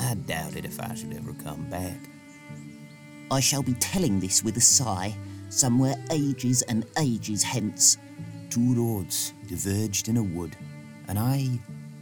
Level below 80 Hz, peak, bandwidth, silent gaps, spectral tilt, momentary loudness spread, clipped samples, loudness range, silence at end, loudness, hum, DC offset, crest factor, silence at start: -56 dBFS; -6 dBFS; over 20 kHz; none; -3.5 dB/octave; 23 LU; under 0.1%; 7 LU; 0 s; -25 LUFS; none; under 0.1%; 20 dB; 0 s